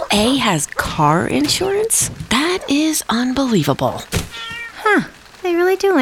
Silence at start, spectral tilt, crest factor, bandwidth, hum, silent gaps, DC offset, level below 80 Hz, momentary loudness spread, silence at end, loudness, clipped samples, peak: 0 s; -3.5 dB/octave; 14 dB; 18 kHz; none; none; under 0.1%; -40 dBFS; 8 LU; 0 s; -17 LUFS; under 0.1%; -2 dBFS